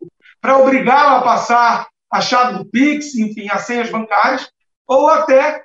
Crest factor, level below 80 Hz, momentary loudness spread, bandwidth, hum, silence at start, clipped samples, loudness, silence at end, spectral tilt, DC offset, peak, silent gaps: 12 dB; -66 dBFS; 10 LU; 8 kHz; none; 0 s; under 0.1%; -14 LUFS; 0.05 s; -4 dB/octave; under 0.1%; -2 dBFS; 4.76-4.85 s